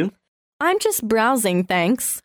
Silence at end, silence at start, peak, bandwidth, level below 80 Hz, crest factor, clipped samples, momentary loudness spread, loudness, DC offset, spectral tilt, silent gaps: 0.05 s; 0 s; -6 dBFS; over 20 kHz; -58 dBFS; 14 dB; under 0.1%; 4 LU; -20 LUFS; under 0.1%; -4 dB/octave; 0.28-0.60 s